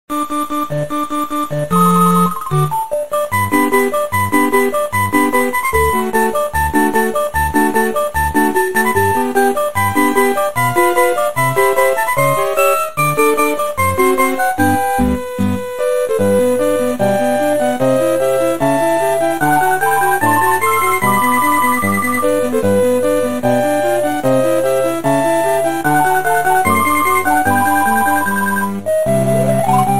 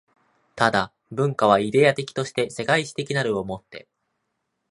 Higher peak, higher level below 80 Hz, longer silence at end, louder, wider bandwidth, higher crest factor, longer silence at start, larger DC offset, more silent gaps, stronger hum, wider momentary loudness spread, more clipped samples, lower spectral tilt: about the same, 0 dBFS vs -2 dBFS; first, -38 dBFS vs -60 dBFS; second, 0 s vs 0.9 s; first, -14 LUFS vs -22 LUFS; first, 16.5 kHz vs 11.5 kHz; second, 14 dB vs 22 dB; second, 0.05 s vs 0.55 s; first, 4% vs under 0.1%; neither; neither; second, 4 LU vs 14 LU; neither; about the same, -5 dB/octave vs -5 dB/octave